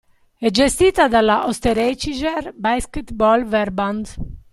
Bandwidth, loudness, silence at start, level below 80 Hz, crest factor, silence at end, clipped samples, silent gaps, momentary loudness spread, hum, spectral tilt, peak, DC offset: 15 kHz; -18 LUFS; 0.4 s; -36 dBFS; 18 dB; 0.15 s; under 0.1%; none; 9 LU; none; -4 dB/octave; -2 dBFS; under 0.1%